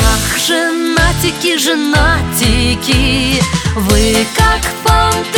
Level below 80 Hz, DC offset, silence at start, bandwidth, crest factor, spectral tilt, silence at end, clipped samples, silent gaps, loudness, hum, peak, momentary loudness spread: -18 dBFS; under 0.1%; 0 s; over 20 kHz; 12 dB; -3.5 dB/octave; 0 s; under 0.1%; none; -12 LUFS; none; 0 dBFS; 2 LU